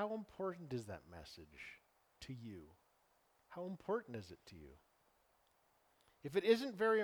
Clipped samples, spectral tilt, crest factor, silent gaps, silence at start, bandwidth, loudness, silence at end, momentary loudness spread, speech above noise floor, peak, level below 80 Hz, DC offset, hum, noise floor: under 0.1%; -6 dB/octave; 24 dB; none; 0 s; 20 kHz; -42 LUFS; 0 s; 23 LU; 35 dB; -20 dBFS; -74 dBFS; under 0.1%; none; -77 dBFS